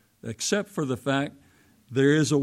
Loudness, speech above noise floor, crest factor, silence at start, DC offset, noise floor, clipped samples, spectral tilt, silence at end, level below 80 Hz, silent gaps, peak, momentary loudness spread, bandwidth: -26 LUFS; 34 dB; 16 dB; 0.25 s; under 0.1%; -58 dBFS; under 0.1%; -5 dB/octave; 0 s; -66 dBFS; none; -10 dBFS; 12 LU; 15.5 kHz